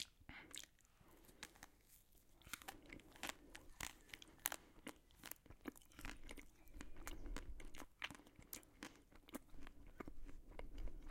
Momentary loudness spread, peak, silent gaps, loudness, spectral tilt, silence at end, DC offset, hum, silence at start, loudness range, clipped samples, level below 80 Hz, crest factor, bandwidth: 12 LU; -14 dBFS; none; -55 LUFS; -2.5 dB/octave; 0 s; under 0.1%; none; 0 s; 5 LU; under 0.1%; -60 dBFS; 40 dB; 16.5 kHz